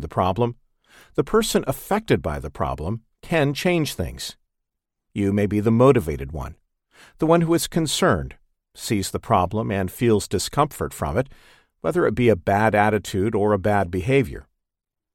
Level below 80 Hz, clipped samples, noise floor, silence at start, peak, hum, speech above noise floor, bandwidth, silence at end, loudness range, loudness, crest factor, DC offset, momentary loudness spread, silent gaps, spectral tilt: -42 dBFS; under 0.1%; -84 dBFS; 0 s; -2 dBFS; none; 63 dB; 17 kHz; 0.75 s; 4 LU; -22 LUFS; 20 dB; under 0.1%; 12 LU; none; -5.5 dB/octave